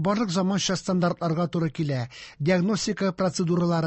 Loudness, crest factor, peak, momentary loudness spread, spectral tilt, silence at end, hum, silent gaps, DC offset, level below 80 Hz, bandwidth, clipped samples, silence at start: -25 LUFS; 14 dB; -12 dBFS; 5 LU; -5.5 dB/octave; 0 s; none; none; under 0.1%; -58 dBFS; 8.6 kHz; under 0.1%; 0 s